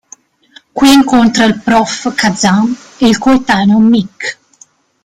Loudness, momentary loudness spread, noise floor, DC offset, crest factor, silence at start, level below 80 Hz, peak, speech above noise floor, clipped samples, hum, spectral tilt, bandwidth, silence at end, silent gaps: -10 LUFS; 10 LU; -46 dBFS; under 0.1%; 10 dB; 0.75 s; -42 dBFS; 0 dBFS; 36 dB; under 0.1%; none; -4.5 dB/octave; 16 kHz; 0.7 s; none